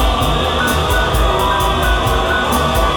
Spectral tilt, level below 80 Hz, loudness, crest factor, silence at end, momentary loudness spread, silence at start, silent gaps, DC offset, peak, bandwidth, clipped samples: -4.5 dB/octave; -20 dBFS; -15 LUFS; 12 dB; 0 s; 1 LU; 0 s; none; under 0.1%; -2 dBFS; 20 kHz; under 0.1%